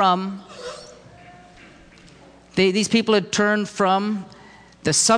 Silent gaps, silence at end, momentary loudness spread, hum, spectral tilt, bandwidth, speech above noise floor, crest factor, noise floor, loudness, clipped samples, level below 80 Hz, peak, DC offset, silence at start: none; 0 s; 18 LU; none; -3.5 dB/octave; 10.5 kHz; 28 dB; 16 dB; -48 dBFS; -20 LUFS; under 0.1%; -58 dBFS; -6 dBFS; under 0.1%; 0 s